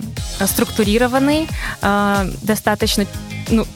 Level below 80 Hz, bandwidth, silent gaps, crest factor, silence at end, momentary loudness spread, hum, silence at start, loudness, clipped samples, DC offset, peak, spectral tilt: -30 dBFS; 18 kHz; none; 16 dB; 0 s; 8 LU; none; 0 s; -18 LUFS; under 0.1%; under 0.1%; -2 dBFS; -4.5 dB/octave